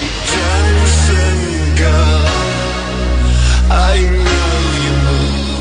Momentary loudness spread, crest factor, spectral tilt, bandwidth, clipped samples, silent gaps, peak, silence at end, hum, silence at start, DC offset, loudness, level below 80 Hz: 5 LU; 10 dB; -4.5 dB/octave; 10 kHz; under 0.1%; none; -2 dBFS; 0 s; none; 0 s; under 0.1%; -13 LUFS; -14 dBFS